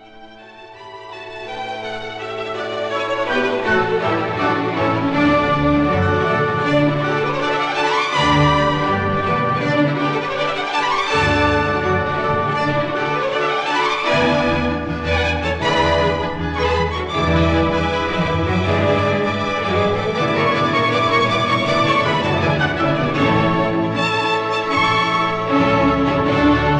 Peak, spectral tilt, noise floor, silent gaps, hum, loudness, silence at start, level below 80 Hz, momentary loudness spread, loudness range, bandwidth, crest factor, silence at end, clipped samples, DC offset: -2 dBFS; -6 dB/octave; -40 dBFS; none; none; -17 LUFS; 0 s; -36 dBFS; 6 LU; 2 LU; 10 kHz; 14 dB; 0 s; under 0.1%; under 0.1%